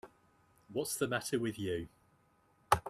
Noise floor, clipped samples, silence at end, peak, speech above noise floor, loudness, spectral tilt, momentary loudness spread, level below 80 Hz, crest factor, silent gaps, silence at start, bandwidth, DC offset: -71 dBFS; under 0.1%; 0 s; -12 dBFS; 34 dB; -37 LUFS; -4 dB/octave; 8 LU; -62 dBFS; 26 dB; none; 0.05 s; 15.5 kHz; under 0.1%